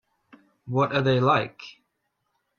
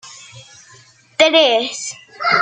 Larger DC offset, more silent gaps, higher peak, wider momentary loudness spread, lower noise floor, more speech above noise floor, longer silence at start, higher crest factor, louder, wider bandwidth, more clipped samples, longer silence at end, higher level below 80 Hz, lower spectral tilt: neither; neither; second, -8 dBFS vs 0 dBFS; about the same, 21 LU vs 22 LU; first, -77 dBFS vs -47 dBFS; first, 53 dB vs 31 dB; first, 0.65 s vs 0.05 s; about the same, 20 dB vs 18 dB; second, -23 LUFS vs -15 LUFS; second, 6.8 kHz vs 9.4 kHz; neither; first, 0.9 s vs 0 s; first, -64 dBFS vs -70 dBFS; first, -7.5 dB/octave vs -1.5 dB/octave